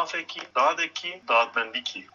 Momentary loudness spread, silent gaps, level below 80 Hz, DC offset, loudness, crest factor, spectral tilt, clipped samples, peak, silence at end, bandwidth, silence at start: 9 LU; none; -82 dBFS; under 0.1%; -25 LUFS; 18 dB; -0.5 dB/octave; under 0.1%; -8 dBFS; 0.1 s; 7.4 kHz; 0 s